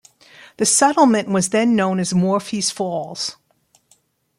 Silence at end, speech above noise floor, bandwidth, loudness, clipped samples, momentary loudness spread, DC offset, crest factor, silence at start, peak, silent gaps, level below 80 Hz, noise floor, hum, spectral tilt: 1.05 s; 43 dB; 14.5 kHz; -18 LUFS; under 0.1%; 11 LU; under 0.1%; 18 dB; 0.6 s; -2 dBFS; none; -64 dBFS; -61 dBFS; none; -4 dB/octave